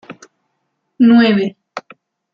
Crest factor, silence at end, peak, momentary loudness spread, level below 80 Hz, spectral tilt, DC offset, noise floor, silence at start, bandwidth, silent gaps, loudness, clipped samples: 14 dB; 0.55 s; -2 dBFS; 22 LU; -60 dBFS; -7 dB/octave; under 0.1%; -70 dBFS; 0.1 s; 6.8 kHz; none; -12 LUFS; under 0.1%